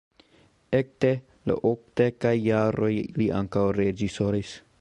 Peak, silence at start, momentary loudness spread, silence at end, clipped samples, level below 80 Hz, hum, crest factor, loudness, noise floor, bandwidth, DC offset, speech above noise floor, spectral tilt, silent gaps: -8 dBFS; 0.7 s; 4 LU; 0.25 s; under 0.1%; -52 dBFS; none; 18 dB; -26 LUFS; -60 dBFS; 10 kHz; under 0.1%; 36 dB; -7.5 dB/octave; none